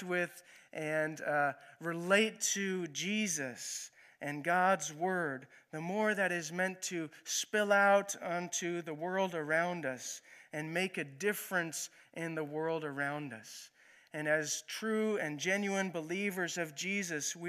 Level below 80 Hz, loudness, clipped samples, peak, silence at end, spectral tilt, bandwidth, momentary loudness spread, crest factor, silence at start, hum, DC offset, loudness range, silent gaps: -88 dBFS; -35 LUFS; under 0.1%; -14 dBFS; 0 s; -3 dB/octave; 15.5 kHz; 13 LU; 22 dB; 0 s; none; under 0.1%; 5 LU; none